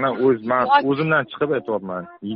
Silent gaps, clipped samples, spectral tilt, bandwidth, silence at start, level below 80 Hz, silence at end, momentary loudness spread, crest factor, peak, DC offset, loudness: none; under 0.1%; -4 dB/octave; 5.4 kHz; 0 s; -62 dBFS; 0 s; 10 LU; 16 dB; -4 dBFS; under 0.1%; -20 LUFS